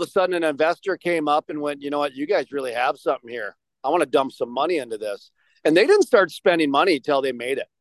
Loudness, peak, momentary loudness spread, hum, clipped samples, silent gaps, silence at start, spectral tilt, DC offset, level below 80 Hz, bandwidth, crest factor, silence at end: -22 LUFS; -4 dBFS; 12 LU; none; under 0.1%; none; 0 s; -4.5 dB/octave; under 0.1%; -74 dBFS; 12.5 kHz; 18 dB; 0.15 s